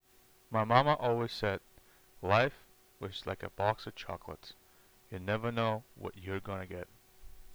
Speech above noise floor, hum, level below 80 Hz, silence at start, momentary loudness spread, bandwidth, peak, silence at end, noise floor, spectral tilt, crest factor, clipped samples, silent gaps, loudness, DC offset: 31 dB; none; -60 dBFS; 0.5 s; 18 LU; over 20 kHz; -6 dBFS; 0 s; -64 dBFS; -6.5 dB/octave; 28 dB; under 0.1%; none; -34 LUFS; under 0.1%